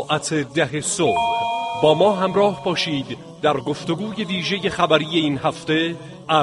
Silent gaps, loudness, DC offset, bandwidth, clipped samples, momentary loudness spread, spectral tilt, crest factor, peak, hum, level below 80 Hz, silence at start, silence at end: none; -20 LUFS; under 0.1%; 11.5 kHz; under 0.1%; 8 LU; -4.5 dB/octave; 18 dB; -2 dBFS; none; -56 dBFS; 0 s; 0 s